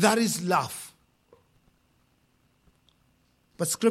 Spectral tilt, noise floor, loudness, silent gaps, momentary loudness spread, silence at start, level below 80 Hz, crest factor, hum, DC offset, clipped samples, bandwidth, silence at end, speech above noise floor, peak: -3.5 dB/octave; -67 dBFS; -27 LUFS; none; 16 LU; 0 s; -70 dBFS; 22 dB; none; under 0.1%; under 0.1%; 16.5 kHz; 0 s; 43 dB; -8 dBFS